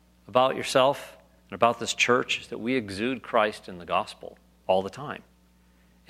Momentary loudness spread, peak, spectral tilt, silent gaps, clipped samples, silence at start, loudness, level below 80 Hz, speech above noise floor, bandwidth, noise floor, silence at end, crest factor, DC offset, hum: 19 LU; -4 dBFS; -3.5 dB/octave; none; under 0.1%; 0.3 s; -26 LUFS; -64 dBFS; 34 dB; 15.5 kHz; -60 dBFS; 0.9 s; 24 dB; under 0.1%; none